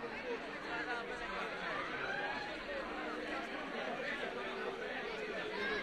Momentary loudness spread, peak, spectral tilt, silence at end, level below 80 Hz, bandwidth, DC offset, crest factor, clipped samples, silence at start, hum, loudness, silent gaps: 3 LU; -28 dBFS; -4 dB/octave; 0 s; -66 dBFS; 13 kHz; under 0.1%; 14 dB; under 0.1%; 0 s; none; -41 LUFS; none